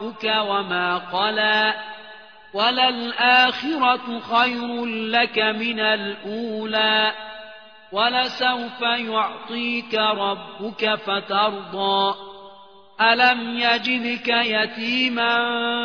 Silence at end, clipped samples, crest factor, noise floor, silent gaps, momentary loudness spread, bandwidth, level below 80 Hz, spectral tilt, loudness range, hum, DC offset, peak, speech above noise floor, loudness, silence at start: 0 s; under 0.1%; 18 dB; -47 dBFS; none; 11 LU; 5.4 kHz; -70 dBFS; -4.5 dB/octave; 3 LU; none; 0.2%; -4 dBFS; 26 dB; -20 LUFS; 0 s